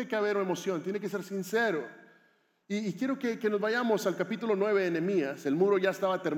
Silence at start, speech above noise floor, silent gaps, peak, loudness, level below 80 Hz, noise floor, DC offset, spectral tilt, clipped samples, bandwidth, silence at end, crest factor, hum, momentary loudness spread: 0 s; 39 dB; none; -14 dBFS; -30 LUFS; under -90 dBFS; -68 dBFS; under 0.1%; -5.5 dB/octave; under 0.1%; 16.5 kHz; 0 s; 16 dB; none; 8 LU